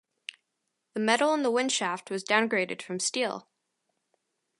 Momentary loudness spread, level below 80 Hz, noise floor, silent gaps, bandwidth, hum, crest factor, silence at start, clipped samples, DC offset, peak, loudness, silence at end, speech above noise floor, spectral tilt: 17 LU; -84 dBFS; -81 dBFS; none; 11.5 kHz; none; 22 dB; 0.95 s; under 0.1%; under 0.1%; -8 dBFS; -27 LUFS; 1.2 s; 54 dB; -2.5 dB/octave